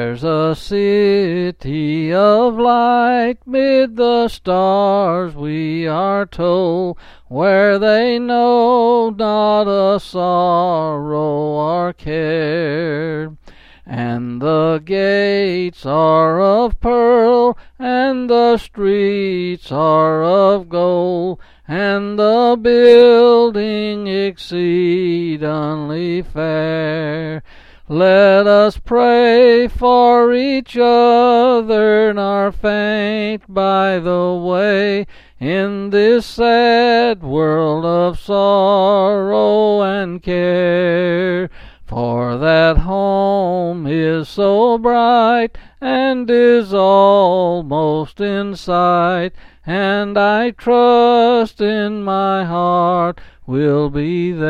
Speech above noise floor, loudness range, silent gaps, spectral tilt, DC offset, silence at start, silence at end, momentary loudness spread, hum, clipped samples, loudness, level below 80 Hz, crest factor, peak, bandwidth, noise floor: 27 dB; 5 LU; none; -7.5 dB/octave; under 0.1%; 0 s; 0 s; 10 LU; none; under 0.1%; -14 LUFS; -36 dBFS; 14 dB; 0 dBFS; 7.4 kHz; -41 dBFS